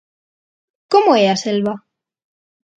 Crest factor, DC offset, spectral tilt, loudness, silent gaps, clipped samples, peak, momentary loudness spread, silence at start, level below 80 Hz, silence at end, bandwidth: 18 dB; under 0.1%; -5 dB/octave; -15 LUFS; none; under 0.1%; 0 dBFS; 11 LU; 0.9 s; -68 dBFS; 1 s; 9 kHz